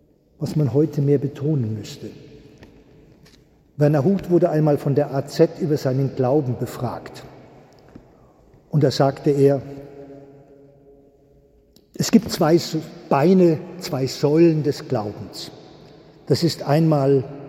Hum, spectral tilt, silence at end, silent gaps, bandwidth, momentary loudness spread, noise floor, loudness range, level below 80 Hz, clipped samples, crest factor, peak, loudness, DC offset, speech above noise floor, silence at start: none; -7 dB/octave; 0 s; none; 16 kHz; 17 LU; -55 dBFS; 5 LU; -56 dBFS; under 0.1%; 20 dB; -2 dBFS; -20 LUFS; under 0.1%; 35 dB; 0.4 s